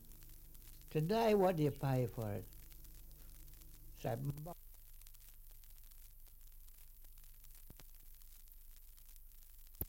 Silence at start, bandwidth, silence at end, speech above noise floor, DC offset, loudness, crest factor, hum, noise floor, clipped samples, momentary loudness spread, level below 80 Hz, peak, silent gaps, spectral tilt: 0 s; 17 kHz; 0 s; 20 dB; under 0.1%; -38 LUFS; 20 dB; none; -57 dBFS; under 0.1%; 25 LU; -56 dBFS; -22 dBFS; none; -7 dB/octave